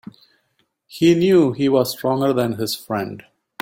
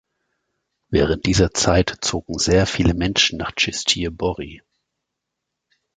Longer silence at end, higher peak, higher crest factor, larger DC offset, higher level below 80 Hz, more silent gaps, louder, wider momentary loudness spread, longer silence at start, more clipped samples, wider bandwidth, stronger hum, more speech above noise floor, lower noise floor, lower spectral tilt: second, 0.4 s vs 1.4 s; about the same, -4 dBFS vs -2 dBFS; about the same, 16 dB vs 20 dB; neither; second, -58 dBFS vs -34 dBFS; neither; about the same, -18 LUFS vs -19 LUFS; first, 14 LU vs 7 LU; about the same, 0.9 s vs 0.9 s; neither; first, 16.5 kHz vs 9.6 kHz; neither; second, 50 dB vs 61 dB; second, -68 dBFS vs -81 dBFS; first, -6 dB/octave vs -4 dB/octave